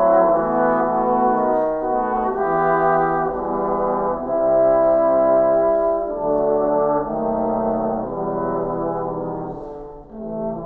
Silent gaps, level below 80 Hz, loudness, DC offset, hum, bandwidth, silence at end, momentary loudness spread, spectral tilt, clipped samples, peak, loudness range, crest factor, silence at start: none; -44 dBFS; -19 LUFS; under 0.1%; none; 3.6 kHz; 0 s; 11 LU; -11 dB/octave; under 0.1%; -6 dBFS; 5 LU; 14 dB; 0 s